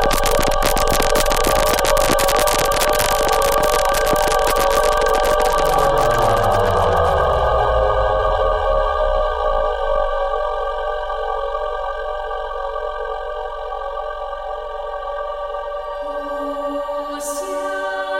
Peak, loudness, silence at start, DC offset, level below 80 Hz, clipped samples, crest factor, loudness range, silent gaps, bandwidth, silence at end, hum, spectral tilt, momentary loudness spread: -2 dBFS; -18 LUFS; 0 s; under 0.1%; -26 dBFS; under 0.1%; 16 dB; 10 LU; none; 16.5 kHz; 0 s; none; -3 dB/octave; 10 LU